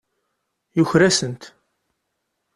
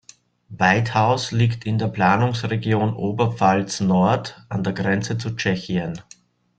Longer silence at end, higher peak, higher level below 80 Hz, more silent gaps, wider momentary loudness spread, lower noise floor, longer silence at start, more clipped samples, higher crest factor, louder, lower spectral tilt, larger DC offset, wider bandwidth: first, 1.1 s vs 0.55 s; about the same, -2 dBFS vs -2 dBFS; about the same, -56 dBFS vs -54 dBFS; neither; first, 15 LU vs 8 LU; first, -76 dBFS vs -49 dBFS; first, 0.75 s vs 0.5 s; neither; about the same, 20 dB vs 18 dB; first, -18 LUFS vs -21 LUFS; second, -4.5 dB/octave vs -6 dB/octave; neither; first, 12.5 kHz vs 9 kHz